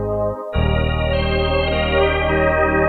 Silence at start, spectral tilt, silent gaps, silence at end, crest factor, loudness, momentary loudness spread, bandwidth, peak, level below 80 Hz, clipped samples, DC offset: 0 s; -8.5 dB/octave; none; 0 s; 14 dB; -18 LUFS; 5 LU; 4.6 kHz; -4 dBFS; -26 dBFS; under 0.1%; under 0.1%